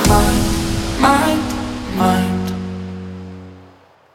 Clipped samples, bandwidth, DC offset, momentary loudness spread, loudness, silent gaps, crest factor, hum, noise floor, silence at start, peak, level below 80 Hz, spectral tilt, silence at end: under 0.1%; 17.5 kHz; under 0.1%; 18 LU; -17 LUFS; none; 18 dB; none; -47 dBFS; 0 s; 0 dBFS; -28 dBFS; -5 dB/octave; 0.5 s